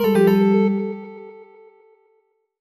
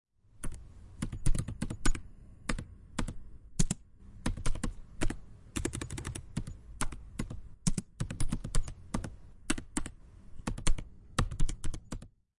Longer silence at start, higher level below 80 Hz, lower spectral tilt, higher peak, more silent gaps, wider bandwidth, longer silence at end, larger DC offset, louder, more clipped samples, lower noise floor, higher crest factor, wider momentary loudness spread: second, 0 s vs 0.4 s; second, -64 dBFS vs -36 dBFS; first, -8 dB/octave vs -4.5 dB/octave; first, -4 dBFS vs -10 dBFS; neither; first, 13.5 kHz vs 11.5 kHz; first, 1.3 s vs 0.3 s; neither; first, -18 LUFS vs -39 LUFS; neither; first, -65 dBFS vs -51 dBFS; second, 16 dB vs 24 dB; first, 24 LU vs 12 LU